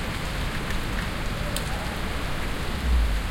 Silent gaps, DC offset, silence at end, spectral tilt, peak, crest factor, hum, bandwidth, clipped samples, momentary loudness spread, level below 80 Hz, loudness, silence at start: none; under 0.1%; 0 s; -4.5 dB/octave; -8 dBFS; 18 dB; none; 17 kHz; under 0.1%; 5 LU; -28 dBFS; -29 LUFS; 0 s